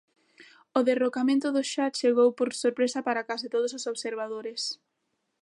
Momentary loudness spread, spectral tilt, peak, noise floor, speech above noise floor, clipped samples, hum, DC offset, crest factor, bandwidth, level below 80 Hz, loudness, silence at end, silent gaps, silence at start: 10 LU; -2.5 dB/octave; -8 dBFS; -78 dBFS; 52 dB; under 0.1%; none; under 0.1%; 20 dB; 11.5 kHz; -84 dBFS; -27 LUFS; 0.65 s; none; 0.75 s